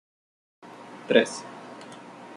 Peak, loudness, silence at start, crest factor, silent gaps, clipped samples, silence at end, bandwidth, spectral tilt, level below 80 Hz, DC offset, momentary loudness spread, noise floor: -4 dBFS; -24 LUFS; 0.65 s; 26 dB; none; under 0.1%; 0 s; 11.5 kHz; -3.5 dB/octave; -78 dBFS; under 0.1%; 22 LU; -44 dBFS